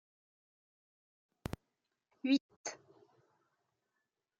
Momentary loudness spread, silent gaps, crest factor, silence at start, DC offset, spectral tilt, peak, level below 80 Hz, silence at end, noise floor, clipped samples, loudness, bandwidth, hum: 17 LU; 2.40-2.49 s, 2.56-2.64 s; 24 dB; 1.5 s; under 0.1%; -4 dB/octave; -18 dBFS; -66 dBFS; 1.65 s; -87 dBFS; under 0.1%; -38 LUFS; 9.6 kHz; none